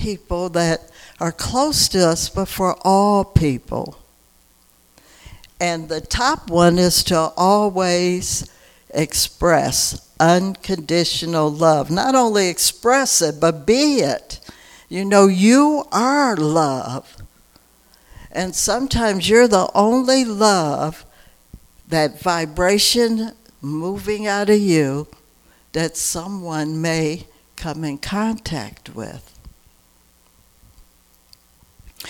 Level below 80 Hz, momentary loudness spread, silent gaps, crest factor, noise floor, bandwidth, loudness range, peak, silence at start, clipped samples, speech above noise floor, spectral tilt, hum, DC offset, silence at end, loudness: -40 dBFS; 14 LU; none; 18 dB; -55 dBFS; 19 kHz; 8 LU; 0 dBFS; 0 s; under 0.1%; 38 dB; -4 dB/octave; none; under 0.1%; 0 s; -17 LUFS